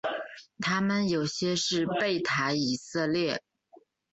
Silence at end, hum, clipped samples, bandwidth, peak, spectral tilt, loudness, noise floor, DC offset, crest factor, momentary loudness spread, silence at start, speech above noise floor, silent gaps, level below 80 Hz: 0.75 s; none; under 0.1%; 8.2 kHz; -14 dBFS; -4 dB/octave; -29 LUFS; -60 dBFS; under 0.1%; 16 dB; 7 LU; 0.05 s; 31 dB; none; -66 dBFS